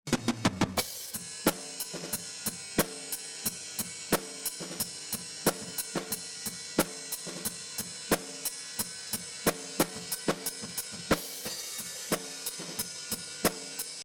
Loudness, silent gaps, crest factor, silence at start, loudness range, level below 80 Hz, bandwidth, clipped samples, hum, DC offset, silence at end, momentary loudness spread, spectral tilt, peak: -33 LUFS; none; 24 dB; 0.05 s; 1 LU; -58 dBFS; over 20 kHz; under 0.1%; none; under 0.1%; 0 s; 6 LU; -2.5 dB/octave; -10 dBFS